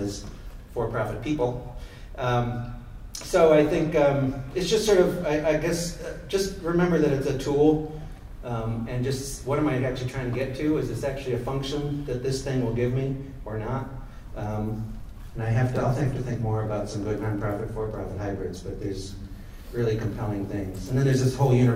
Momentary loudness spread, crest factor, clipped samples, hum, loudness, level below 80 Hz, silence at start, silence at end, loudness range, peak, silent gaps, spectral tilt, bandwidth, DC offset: 16 LU; 20 dB; under 0.1%; none; -26 LUFS; -40 dBFS; 0 s; 0 s; 7 LU; -6 dBFS; none; -6.5 dB/octave; 16 kHz; under 0.1%